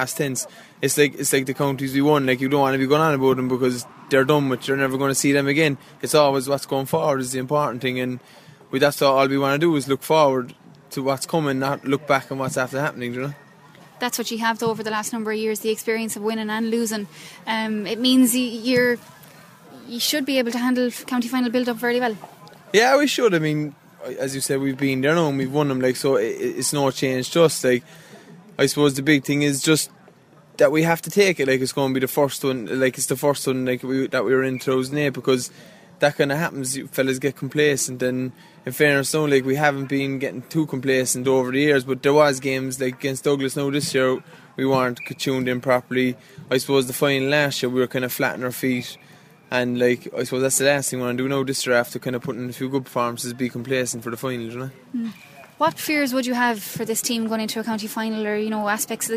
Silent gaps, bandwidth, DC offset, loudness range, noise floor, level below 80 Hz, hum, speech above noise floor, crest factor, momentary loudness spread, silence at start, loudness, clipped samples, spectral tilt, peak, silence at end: none; 15.5 kHz; under 0.1%; 4 LU; -51 dBFS; -64 dBFS; none; 29 dB; 18 dB; 9 LU; 0 s; -21 LUFS; under 0.1%; -4.5 dB/octave; -2 dBFS; 0 s